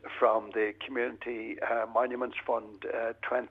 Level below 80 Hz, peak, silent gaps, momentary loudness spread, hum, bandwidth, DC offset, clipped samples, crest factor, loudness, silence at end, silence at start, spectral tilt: -72 dBFS; -12 dBFS; none; 8 LU; none; 5 kHz; under 0.1%; under 0.1%; 20 dB; -32 LUFS; 0 s; 0.05 s; -6.5 dB/octave